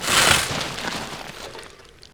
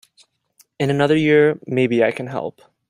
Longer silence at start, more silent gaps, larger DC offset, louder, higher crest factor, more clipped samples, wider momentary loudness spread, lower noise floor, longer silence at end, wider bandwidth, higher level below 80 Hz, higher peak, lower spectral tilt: second, 0 s vs 0.8 s; neither; neither; about the same, -20 LUFS vs -18 LUFS; first, 22 dB vs 16 dB; neither; first, 21 LU vs 13 LU; second, -45 dBFS vs -58 dBFS; second, 0.25 s vs 0.4 s; first, over 20 kHz vs 11 kHz; first, -46 dBFS vs -60 dBFS; about the same, -2 dBFS vs -2 dBFS; second, -1.5 dB/octave vs -7 dB/octave